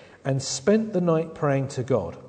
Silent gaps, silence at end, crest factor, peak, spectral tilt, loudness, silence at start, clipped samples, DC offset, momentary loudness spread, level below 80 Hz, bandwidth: none; 0 s; 16 dB; -8 dBFS; -6 dB/octave; -24 LUFS; 0.25 s; under 0.1%; under 0.1%; 5 LU; -58 dBFS; 9.4 kHz